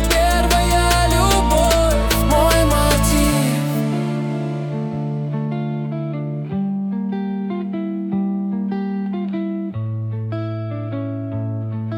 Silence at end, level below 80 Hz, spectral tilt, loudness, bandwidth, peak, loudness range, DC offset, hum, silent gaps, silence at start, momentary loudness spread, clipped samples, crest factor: 0 s; -26 dBFS; -5 dB/octave; -19 LUFS; 19 kHz; -4 dBFS; 8 LU; under 0.1%; none; none; 0 s; 10 LU; under 0.1%; 14 dB